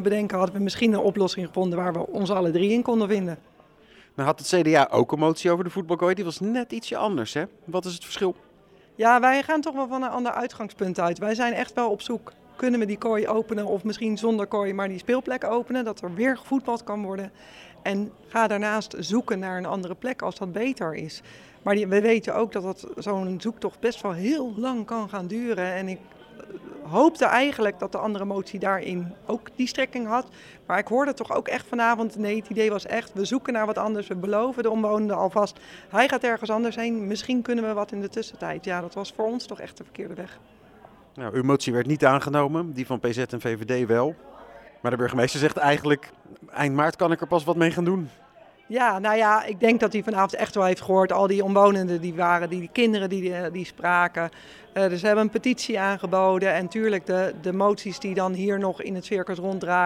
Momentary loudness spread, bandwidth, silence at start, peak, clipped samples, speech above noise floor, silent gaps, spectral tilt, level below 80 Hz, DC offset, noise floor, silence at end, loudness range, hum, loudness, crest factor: 11 LU; 15.5 kHz; 0 s; -4 dBFS; under 0.1%; 31 dB; none; -5.5 dB/octave; -64 dBFS; under 0.1%; -55 dBFS; 0 s; 5 LU; none; -25 LUFS; 22 dB